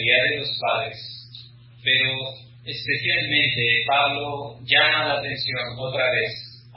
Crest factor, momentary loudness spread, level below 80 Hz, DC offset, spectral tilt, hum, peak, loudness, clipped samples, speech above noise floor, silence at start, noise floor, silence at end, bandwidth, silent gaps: 20 dB; 16 LU; -58 dBFS; under 0.1%; -8 dB/octave; none; -2 dBFS; -21 LUFS; under 0.1%; 22 dB; 0 s; -44 dBFS; 0 s; 5.8 kHz; none